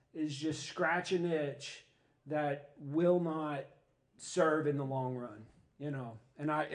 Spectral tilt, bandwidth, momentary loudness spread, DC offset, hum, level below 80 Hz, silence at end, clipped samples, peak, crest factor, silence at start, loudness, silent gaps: -6 dB/octave; 10 kHz; 16 LU; under 0.1%; none; -78 dBFS; 0 s; under 0.1%; -18 dBFS; 18 dB; 0.15 s; -36 LUFS; none